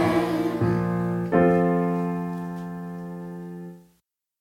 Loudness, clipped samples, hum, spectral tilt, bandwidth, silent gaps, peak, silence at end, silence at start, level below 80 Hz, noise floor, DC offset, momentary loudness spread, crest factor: -24 LUFS; under 0.1%; none; -8.5 dB/octave; 13 kHz; none; -6 dBFS; 0.6 s; 0 s; -52 dBFS; -69 dBFS; under 0.1%; 17 LU; 18 dB